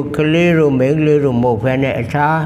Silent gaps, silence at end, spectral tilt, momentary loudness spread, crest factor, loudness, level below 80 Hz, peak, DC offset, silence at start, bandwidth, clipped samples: none; 0 s; -8 dB/octave; 4 LU; 12 dB; -14 LUFS; -42 dBFS; -2 dBFS; under 0.1%; 0 s; 13 kHz; under 0.1%